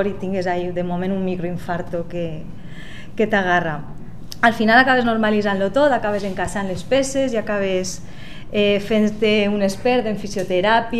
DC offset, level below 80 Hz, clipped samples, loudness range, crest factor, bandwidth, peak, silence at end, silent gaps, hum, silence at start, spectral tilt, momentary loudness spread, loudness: 3%; -40 dBFS; under 0.1%; 6 LU; 20 dB; 13.5 kHz; 0 dBFS; 0 s; none; none; 0 s; -5 dB/octave; 17 LU; -19 LUFS